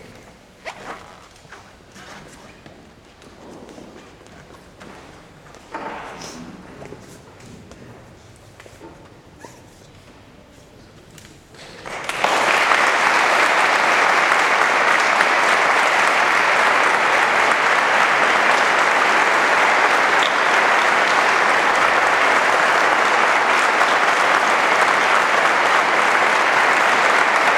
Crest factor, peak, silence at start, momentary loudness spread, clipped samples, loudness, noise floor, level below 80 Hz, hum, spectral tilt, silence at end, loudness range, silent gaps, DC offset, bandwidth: 18 dB; 0 dBFS; 0.1 s; 16 LU; under 0.1%; -15 LUFS; -45 dBFS; -58 dBFS; none; -1.5 dB/octave; 0 s; 21 LU; none; under 0.1%; 17 kHz